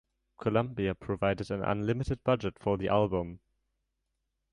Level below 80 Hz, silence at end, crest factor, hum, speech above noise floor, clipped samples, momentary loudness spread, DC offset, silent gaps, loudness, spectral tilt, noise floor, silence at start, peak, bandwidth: -52 dBFS; 1.15 s; 20 dB; none; 52 dB; under 0.1%; 6 LU; under 0.1%; none; -31 LUFS; -8 dB/octave; -82 dBFS; 0.4 s; -12 dBFS; 10.5 kHz